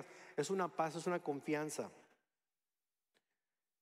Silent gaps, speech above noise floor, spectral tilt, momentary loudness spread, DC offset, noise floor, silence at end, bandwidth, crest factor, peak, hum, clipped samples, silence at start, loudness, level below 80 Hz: none; over 50 dB; -5 dB/octave; 8 LU; under 0.1%; under -90 dBFS; 1.8 s; 15.5 kHz; 20 dB; -24 dBFS; none; under 0.1%; 0 s; -41 LUFS; under -90 dBFS